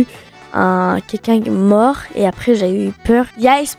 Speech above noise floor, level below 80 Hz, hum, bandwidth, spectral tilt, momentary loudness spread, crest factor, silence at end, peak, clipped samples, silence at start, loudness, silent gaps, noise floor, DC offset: 24 dB; -40 dBFS; none; 15.5 kHz; -6 dB/octave; 6 LU; 14 dB; 0.05 s; -2 dBFS; under 0.1%; 0 s; -15 LUFS; none; -38 dBFS; under 0.1%